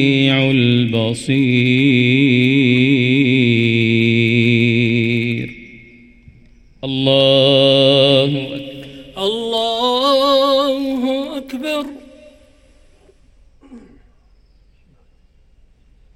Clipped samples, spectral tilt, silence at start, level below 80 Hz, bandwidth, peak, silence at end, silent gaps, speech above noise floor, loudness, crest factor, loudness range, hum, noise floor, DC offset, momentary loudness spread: under 0.1%; -6.5 dB/octave; 0 s; -50 dBFS; 13.5 kHz; 0 dBFS; 2.35 s; none; 38 dB; -14 LUFS; 16 dB; 10 LU; none; -51 dBFS; under 0.1%; 13 LU